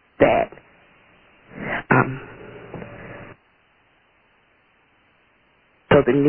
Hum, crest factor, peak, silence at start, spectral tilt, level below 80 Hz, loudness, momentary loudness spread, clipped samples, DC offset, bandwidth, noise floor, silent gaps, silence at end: none; 22 dB; -2 dBFS; 0.2 s; -11 dB/octave; -50 dBFS; -20 LUFS; 23 LU; under 0.1%; under 0.1%; 3.5 kHz; -60 dBFS; none; 0 s